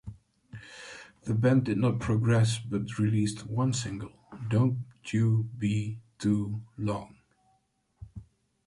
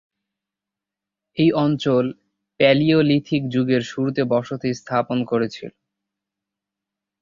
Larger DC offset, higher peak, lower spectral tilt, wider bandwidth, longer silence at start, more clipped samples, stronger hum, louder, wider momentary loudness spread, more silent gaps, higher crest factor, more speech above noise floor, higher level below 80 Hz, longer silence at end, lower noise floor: neither; second, -14 dBFS vs -2 dBFS; about the same, -6.5 dB/octave vs -7 dB/octave; first, 11.5 kHz vs 7.6 kHz; second, 0.05 s vs 1.35 s; neither; neither; second, -29 LUFS vs -20 LUFS; first, 21 LU vs 11 LU; neither; about the same, 16 dB vs 20 dB; second, 45 dB vs 68 dB; about the same, -56 dBFS vs -60 dBFS; second, 0.45 s vs 1.5 s; second, -72 dBFS vs -87 dBFS